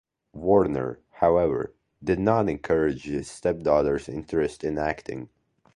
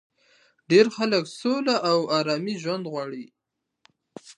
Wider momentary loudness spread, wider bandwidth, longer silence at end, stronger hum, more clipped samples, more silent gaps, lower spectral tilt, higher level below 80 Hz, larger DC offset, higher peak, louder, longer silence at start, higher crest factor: about the same, 13 LU vs 13 LU; about the same, 11 kHz vs 11 kHz; first, 0.5 s vs 0.05 s; neither; neither; neither; first, -7.5 dB/octave vs -5 dB/octave; first, -48 dBFS vs -80 dBFS; neither; about the same, -6 dBFS vs -4 dBFS; about the same, -25 LUFS vs -23 LUFS; second, 0.35 s vs 0.7 s; about the same, 20 dB vs 22 dB